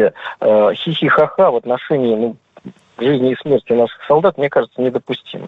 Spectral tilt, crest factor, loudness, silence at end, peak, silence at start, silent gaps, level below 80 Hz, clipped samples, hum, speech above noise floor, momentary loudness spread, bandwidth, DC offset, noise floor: -8 dB/octave; 12 dB; -15 LUFS; 0 s; -2 dBFS; 0 s; none; -58 dBFS; under 0.1%; none; 23 dB; 7 LU; 5.4 kHz; under 0.1%; -38 dBFS